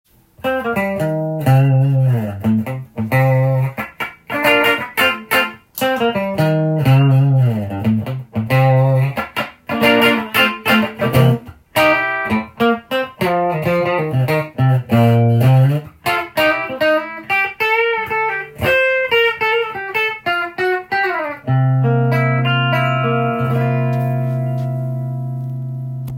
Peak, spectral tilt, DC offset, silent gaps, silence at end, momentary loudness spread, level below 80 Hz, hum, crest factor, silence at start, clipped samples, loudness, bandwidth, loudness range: 0 dBFS; -6.5 dB/octave; under 0.1%; none; 0 s; 9 LU; -52 dBFS; none; 16 dB; 0.45 s; under 0.1%; -16 LUFS; 16.5 kHz; 2 LU